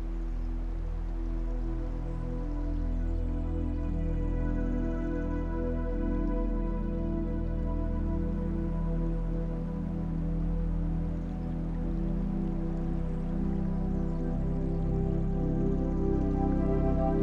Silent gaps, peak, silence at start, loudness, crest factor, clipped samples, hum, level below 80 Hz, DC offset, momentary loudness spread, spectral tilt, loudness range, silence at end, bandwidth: none; -16 dBFS; 0 s; -33 LUFS; 14 dB; under 0.1%; none; -32 dBFS; under 0.1%; 7 LU; -10.5 dB/octave; 3 LU; 0 s; 3.6 kHz